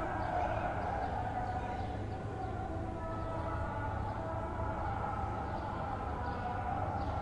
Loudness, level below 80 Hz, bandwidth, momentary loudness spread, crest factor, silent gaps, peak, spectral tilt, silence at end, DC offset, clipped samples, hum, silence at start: -38 LUFS; -46 dBFS; 10.5 kHz; 4 LU; 14 dB; none; -24 dBFS; -8 dB/octave; 0 s; under 0.1%; under 0.1%; none; 0 s